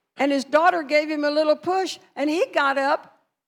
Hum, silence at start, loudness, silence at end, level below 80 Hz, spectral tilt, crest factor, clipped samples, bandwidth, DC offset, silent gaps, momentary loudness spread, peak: none; 0.2 s; -22 LUFS; 0.45 s; -76 dBFS; -3 dB/octave; 18 dB; under 0.1%; 13.5 kHz; under 0.1%; none; 7 LU; -6 dBFS